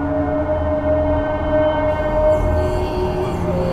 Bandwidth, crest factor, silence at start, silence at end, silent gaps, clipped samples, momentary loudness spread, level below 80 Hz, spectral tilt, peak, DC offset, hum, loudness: 13 kHz; 12 dB; 0 s; 0 s; none; under 0.1%; 4 LU; -28 dBFS; -8 dB/octave; -6 dBFS; under 0.1%; none; -19 LUFS